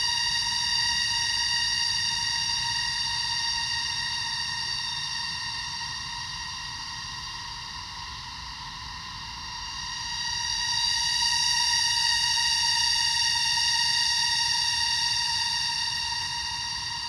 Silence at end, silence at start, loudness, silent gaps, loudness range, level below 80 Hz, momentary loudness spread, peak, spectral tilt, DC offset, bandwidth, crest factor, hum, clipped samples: 0 s; 0 s; -24 LUFS; none; 12 LU; -50 dBFS; 13 LU; -12 dBFS; 1 dB/octave; under 0.1%; 16 kHz; 16 dB; none; under 0.1%